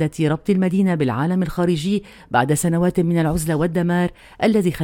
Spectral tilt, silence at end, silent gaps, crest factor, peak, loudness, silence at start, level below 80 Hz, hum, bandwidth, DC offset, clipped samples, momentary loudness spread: -6.5 dB/octave; 0 s; none; 16 dB; -2 dBFS; -20 LUFS; 0 s; -42 dBFS; none; 17 kHz; under 0.1%; under 0.1%; 4 LU